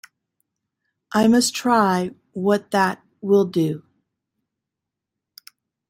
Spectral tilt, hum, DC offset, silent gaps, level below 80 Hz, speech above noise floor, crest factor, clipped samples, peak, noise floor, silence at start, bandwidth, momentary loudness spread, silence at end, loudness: -5 dB/octave; none; under 0.1%; none; -64 dBFS; 66 dB; 18 dB; under 0.1%; -4 dBFS; -84 dBFS; 1.1 s; 16.5 kHz; 9 LU; 2.1 s; -20 LUFS